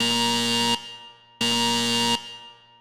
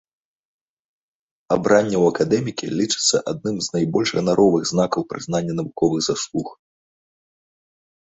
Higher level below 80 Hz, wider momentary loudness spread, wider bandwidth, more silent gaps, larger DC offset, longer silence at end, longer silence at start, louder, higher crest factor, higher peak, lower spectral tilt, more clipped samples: second, -62 dBFS vs -56 dBFS; first, 19 LU vs 9 LU; first, over 20 kHz vs 8.4 kHz; neither; neither; second, 0.25 s vs 1.5 s; second, 0 s vs 1.5 s; about the same, -22 LUFS vs -20 LUFS; about the same, 16 dB vs 20 dB; second, -10 dBFS vs -2 dBFS; second, -2 dB/octave vs -4.5 dB/octave; neither